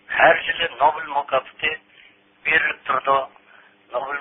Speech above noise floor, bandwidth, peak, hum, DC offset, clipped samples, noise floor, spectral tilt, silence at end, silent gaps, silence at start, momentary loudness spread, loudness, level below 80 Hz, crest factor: 31 dB; 3.9 kHz; -2 dBFS; none; under 0.1%; under 0.1%; -52 dBFS; -7.5 dB/octave; 0 s; none; 0.1 s; 13 LU; -20 LUFS; -58 dBFS; 20 dB